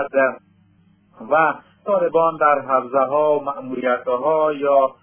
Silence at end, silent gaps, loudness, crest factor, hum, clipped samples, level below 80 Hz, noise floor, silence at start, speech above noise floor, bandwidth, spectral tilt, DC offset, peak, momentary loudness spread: 0.1 s; none; -19 LUFS; 16 dB; none; under 0.1%; -70 dBFS; -56 dBFS; 0 s; 38 dB; 3.5 kHz; -9 dB/octave; under 0.1%; -2 dBFS; 6 LU